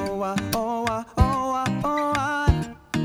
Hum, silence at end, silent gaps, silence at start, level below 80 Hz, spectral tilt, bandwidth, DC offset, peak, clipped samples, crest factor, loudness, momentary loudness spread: none; 0 s; none; 0 s; -32 dBFS; -6 dB/octave; over 20 kHz; under 0.1%; -6 dBFS; under 0.1%; 18 dB; -24 LUFS; 5 LU